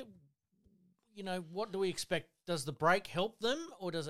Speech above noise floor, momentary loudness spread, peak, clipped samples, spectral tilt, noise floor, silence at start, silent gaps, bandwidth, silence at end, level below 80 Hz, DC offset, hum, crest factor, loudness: 36 dB; 10 LU; -16 dBFS; under 0.1%; -4 dB/octave; -72 dBFS; 0 s; none; 16 kHz; 0 s; -72 dBFS; under 0.1%; none; 22 dB; -36 LUFS